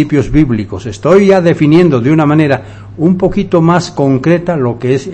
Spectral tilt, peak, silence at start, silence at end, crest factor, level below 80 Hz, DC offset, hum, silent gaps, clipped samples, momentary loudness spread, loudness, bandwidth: -7.5 dB/octave; 0 dBFS; 0 s; 0 s; 10 dB; -32 dBFS; under 0.1%; none; none; 1%; 8 LU; -10 LUFS; 8.6 kHz